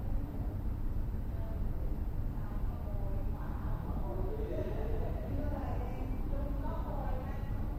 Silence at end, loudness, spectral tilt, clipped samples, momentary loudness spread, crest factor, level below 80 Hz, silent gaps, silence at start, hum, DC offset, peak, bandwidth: 0 s; -39 LUFS; -9 dB/octave; under 0.1%; 2 LU; 14 dB; -36 dBFS; none; 0 s; none; under 0.1%; -22 dBFS; 15 kHz